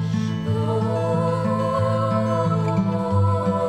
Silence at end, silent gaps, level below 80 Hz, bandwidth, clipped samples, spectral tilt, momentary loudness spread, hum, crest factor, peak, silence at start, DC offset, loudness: 0 s; none; -52 dBFS; 9.8 kHz; under 0.1%; -8.5 dB/octave; 3 LU; none; 12 dB; -10 dBFS; 0 s; under 0.1%; -22 LUFS